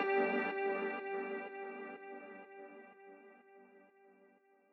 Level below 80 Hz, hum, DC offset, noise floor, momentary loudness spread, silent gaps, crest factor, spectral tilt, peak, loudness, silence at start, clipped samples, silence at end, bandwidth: under -90 dBFS; none; under 0.1%; -69 dBFS; 25 LU; none; 20 dB; -2.5 dB/octave; -22 dBFS; -39 LUFS; 0 s; under 0.1%; 0.45 s; 5.4 kHz